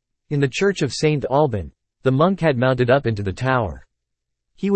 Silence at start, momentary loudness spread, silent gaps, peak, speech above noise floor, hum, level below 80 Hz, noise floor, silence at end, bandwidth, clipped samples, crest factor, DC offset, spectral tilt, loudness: 0.3 s; 10 LU; none; -4 dBFS; 60 dB; none; -46 dBFS; -78 dBFS; 0 s; 8.8 kHz; under 0.1%; 16 dB; under 0.1%; -6.5 dB/octave; -20 LUFS